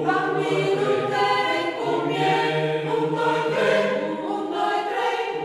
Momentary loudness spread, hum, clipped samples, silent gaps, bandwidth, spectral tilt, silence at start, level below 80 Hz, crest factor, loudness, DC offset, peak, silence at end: 4 LU; none; under 0.1%; none; 13 kHz; -5.5 dB/octave; 0 s; -70 dBFS; 14 dB; -23 LUFS; under 0.1%; -8 dBFS; 0 s